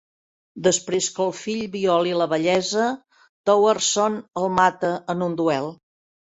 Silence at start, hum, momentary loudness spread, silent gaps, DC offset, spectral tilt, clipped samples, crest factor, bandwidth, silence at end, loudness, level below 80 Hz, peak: 0.55 s; none; 8 LU; 3.29-3.44 s; under 0.1%; -3.5 dB/octave; under 0.1%; 18 dB; 8.4 kHz; 0.65 s; -22 LUFS; -62 dBFS; -4 dBFS